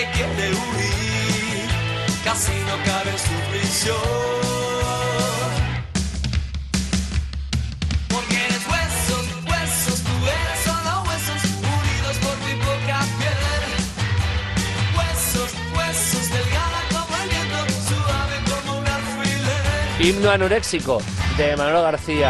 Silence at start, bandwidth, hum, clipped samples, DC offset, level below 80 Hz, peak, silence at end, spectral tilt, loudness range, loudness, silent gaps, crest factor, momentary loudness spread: 0 s; 12.5 kHz; none; under 0.1%; under 0.1%; -32 dBFS; -4 dBFS; 0 s; -4 dB/octave; 3 LU; -21 LUFS; none; 18 dB; 4 LU